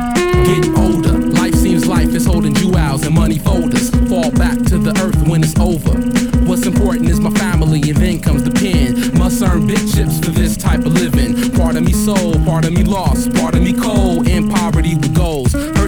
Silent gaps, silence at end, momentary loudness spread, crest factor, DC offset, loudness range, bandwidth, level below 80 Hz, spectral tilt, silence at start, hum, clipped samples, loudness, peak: none; 0 s; 2 LU; 12 dB; under 0.1%; 1 LU; over 20 kHz; -20 dBFS; -6 dB/octave; 0 s; none; under 0.1%; -13 LUFS; 0 dBFS